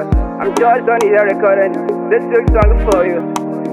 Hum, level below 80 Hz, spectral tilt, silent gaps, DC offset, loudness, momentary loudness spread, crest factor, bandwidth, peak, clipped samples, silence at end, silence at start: none; -20 dBFS; -7 dB/octave; none; under 0.1%; -13 LUFS; 7 LU; 12 dB; 12.5 kHz; 0 dBFS; under 0.1%; 0 s; 0 s